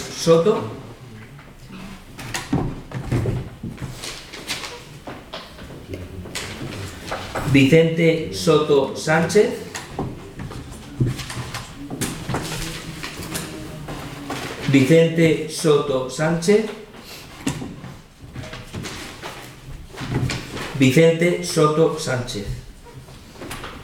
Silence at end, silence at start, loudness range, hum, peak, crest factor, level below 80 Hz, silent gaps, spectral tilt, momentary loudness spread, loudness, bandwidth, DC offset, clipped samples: 0 s; 0 s; 12 LU; none; -2 dBFS; 20 dB; -42 dBFS; none; -5.5 dB/octave; 21 LU; -21 LUFS; 17.5 kHz; under 0.1%; under 0.1%